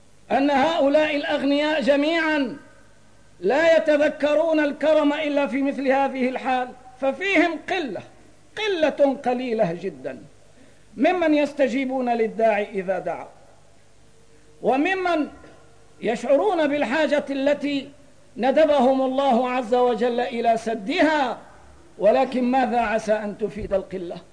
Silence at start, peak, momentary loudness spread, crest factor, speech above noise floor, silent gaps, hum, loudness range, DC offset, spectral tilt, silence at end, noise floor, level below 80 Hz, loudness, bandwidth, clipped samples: 0.3 s; -8 dBFS; 9 LU; 14 dB; 34 dB; none; 50 Hz at -60 dBFS; 5 LU; 0.3%; -5 dB/octave; 0.1 s; -55 dBFS; -56 dBFS; -22 LUFS; 10.5 kHz; under 0.1%